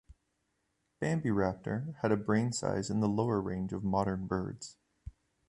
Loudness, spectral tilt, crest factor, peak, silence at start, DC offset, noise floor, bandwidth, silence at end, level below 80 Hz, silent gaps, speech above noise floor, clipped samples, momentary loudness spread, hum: -33 LUFS; -6.5 dB/octave; 18 dB; -16 dBFS; 0.1 s; under 0.1%; -80 dBFS; 11.5 kHz; 0.4 s; -56 dBFS; none; 47 dB; under 0.1%; 17 LU; none